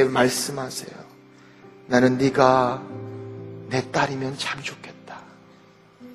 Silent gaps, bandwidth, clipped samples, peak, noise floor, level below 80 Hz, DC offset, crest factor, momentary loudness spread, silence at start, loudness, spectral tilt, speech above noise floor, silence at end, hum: none; 13.5 kHz; under 0.1%; -2 dBFS; -52 dBFS; -58 dBFS; under 0.1%; 22 dB; 23 LU; 0 s; -22 LUFS; -4.5 dB/octave; 30 dB; 0 s; none